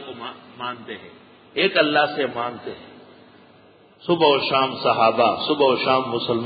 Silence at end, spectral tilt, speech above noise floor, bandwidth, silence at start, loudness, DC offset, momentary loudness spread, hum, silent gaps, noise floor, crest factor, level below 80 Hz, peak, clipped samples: 0 s; -9.5 dB/octave; 31 dB; 5 kHz; 0 s; -20 LUFS; under 0.1%; 18 LU; none; none; -52 dBFS; 18 dB; -64 dBFS; -4 dBFS; under 0.1%